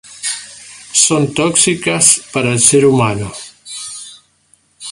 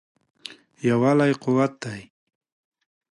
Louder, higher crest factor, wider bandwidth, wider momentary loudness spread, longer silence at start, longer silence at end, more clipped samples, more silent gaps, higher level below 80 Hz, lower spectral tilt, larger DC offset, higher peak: first, -12 LUFS vs -22 LUFS; about the same, 16 dB vs 16 dB; first, 16 kHz vs 11.5 kHz; about the same, 20 LU vs 22 LU; second, 0.1 s vs 0.5 s; second, 0 s vs 1.1 s; neither; neither; first, -50 dBFS vs -66 dBFS; second, -3 dB/octave vs -7 dB/octave; neither; first, 0 dBFS vs -8 dBFS